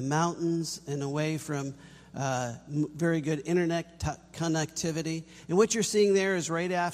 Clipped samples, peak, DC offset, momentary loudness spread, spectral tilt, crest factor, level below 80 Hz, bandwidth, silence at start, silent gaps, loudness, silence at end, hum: under 0.1%; -12 dBFS; under 0.1%; 11 LU; -5 dB/octave; 18 dB; -56 dBFS; 15 kHz; 0 s; none; -29 LUFS; 0 s; none